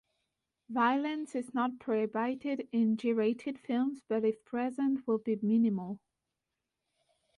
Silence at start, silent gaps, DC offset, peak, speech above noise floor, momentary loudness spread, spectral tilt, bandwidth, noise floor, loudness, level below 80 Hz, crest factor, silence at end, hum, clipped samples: 0.7 s; none; under 0.1%; -18 dBFS; 56 dB; 8 LU; -7 dB/octave; 11 kHz; -87 dBFS; -32 LUFS; -80 dBFS; 16 dB; 1.4 s; none; under 0.1%